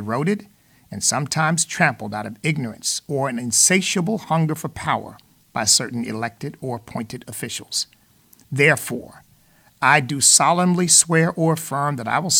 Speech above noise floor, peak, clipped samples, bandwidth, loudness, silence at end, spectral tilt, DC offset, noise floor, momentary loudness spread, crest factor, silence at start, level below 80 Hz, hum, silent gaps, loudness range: 35 dB; -2 dBFS; under 0.1%; 19 kHz; -19 LUFS; 0 s; -3 dB/octave; under 0.1%; -55 dBFS; 16 LU; 20 dB; 0 s; -60 dBFS; none; none; 7 LU